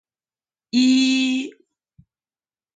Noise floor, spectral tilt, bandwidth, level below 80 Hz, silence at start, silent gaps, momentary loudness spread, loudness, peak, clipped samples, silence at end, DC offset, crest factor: under -90 dBFS; -2 dB/octave; 9.2 kHz; -72 dBFS; 0.75 s; none; 10 LU; -19 LUFS; -8 dBFS; under 0.1%; 1.25 s; under 0.1%; 16 dB